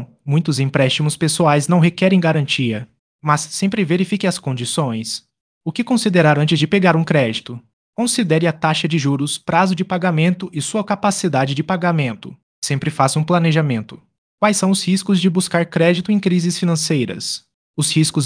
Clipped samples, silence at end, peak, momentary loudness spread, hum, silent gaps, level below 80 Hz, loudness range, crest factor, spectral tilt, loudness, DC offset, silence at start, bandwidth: under 0.1%; 0 s; 0 dBFS; 10 LU; none; 2.99-3.19 s, 5.40-5.61 s, 7.73-7.93 s, 12.43-12.62 s, 14.18-14.38 s, 17.54-17.74 s; -60 dBFS; 3 LU; 16 dB; -5 dB/octave; -17 LUFS; under 0.1%; 0 s; 10.5 kHz